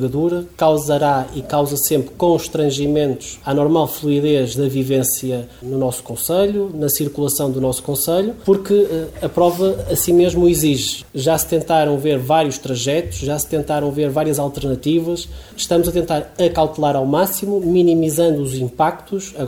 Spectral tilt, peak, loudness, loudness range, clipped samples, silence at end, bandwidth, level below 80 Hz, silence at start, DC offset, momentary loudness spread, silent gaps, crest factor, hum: -5 dB/octave; -2 dBFS; -17 LUFS; 3 LU; under 0.1%; 0 s; over 20 kHz; -42 dBFS; 0 s; 0.1%; 7 LU; none; 14 dB; none